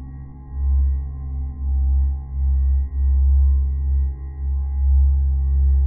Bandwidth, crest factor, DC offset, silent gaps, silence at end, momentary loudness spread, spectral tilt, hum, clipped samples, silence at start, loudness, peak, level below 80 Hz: 1.1 kHz; 8 dB; under 0.1%; none; 0 s; 11 LU; -14.5 dB/octave; none; under 0.1%; 0 s; -21 LUFS; -10 dBFS; -18 dBFS